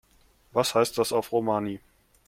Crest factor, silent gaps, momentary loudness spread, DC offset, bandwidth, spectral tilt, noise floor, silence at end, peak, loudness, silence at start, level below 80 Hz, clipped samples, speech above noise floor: 20 dB; none; 9 LU; under 0.1%; 16.5 kHz; -4 dB/octave; -61 dBFS; 0.5 s; -8 dBFS; -26 LUFS; 0.55 s; -62 dBFS; under 0.1%; 36 dB